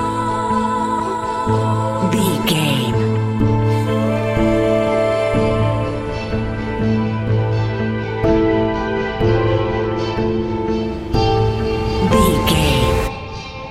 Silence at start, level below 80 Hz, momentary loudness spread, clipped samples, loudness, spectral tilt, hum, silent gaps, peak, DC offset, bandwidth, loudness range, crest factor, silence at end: 0 s; -30 dBFS; 6 LU; under 0.1%; -18 LUFS; -6.5 dB/octave; none; none; 0 dBFS; under 0.1%; 15.5 kHz; 2 LU; 16 dB; 0 s